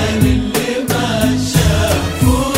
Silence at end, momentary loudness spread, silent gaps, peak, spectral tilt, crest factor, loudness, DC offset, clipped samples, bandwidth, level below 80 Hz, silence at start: 0 s; 3 LU; none; 0 dBFS; -5 dB/octave; 14 dB; -15 LUFS; under 0.1%; under 0.1%; 16.5 kHz; -24 dBFS; 0 s